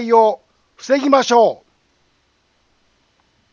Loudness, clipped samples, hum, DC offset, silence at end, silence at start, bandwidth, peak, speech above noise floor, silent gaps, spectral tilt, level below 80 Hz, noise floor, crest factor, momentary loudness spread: -15 LUFS; under 0.1%; none; under 0.1%; 2 s; 0 s; 7.4 kHz; 0 dBFS; 48 dB; none; -3.5 dB/octave; -68 dBFS; -62 dBFS; 18 dB; 21 LU